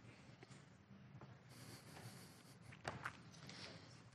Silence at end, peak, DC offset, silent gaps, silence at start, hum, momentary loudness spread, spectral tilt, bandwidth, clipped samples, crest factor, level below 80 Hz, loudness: 0 s; -28 dBFS; under 0.1%; none; 0 s; none; 11 LU; -4 dB/octave; 13 kHz; under 0.1%; 28 dB; -80 dBFS; -57 LUFS